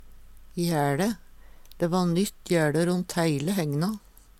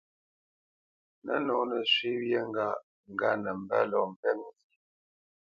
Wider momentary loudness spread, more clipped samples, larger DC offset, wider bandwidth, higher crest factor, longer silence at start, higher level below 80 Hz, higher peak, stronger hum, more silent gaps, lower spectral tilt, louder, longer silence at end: second, 7 LU vs 12 LU; neither; neither; first, 16 kHz vs 7.2 kHz; about the same, 16 dB vs 20 dB; second, 0.05 s vs 1.25 s; first, -52 dBFS vs -76 dBFS; about the same, -12 dBFS vs -12 dBFS; neither; second, none vs 2.83-3.04 s, 4.16-4.23 s; about the same, -6 dB/octave vs -5.5 dB/octave; first, -26 LUFS vs -30 LUFS; second, 0.4 s vs 1 s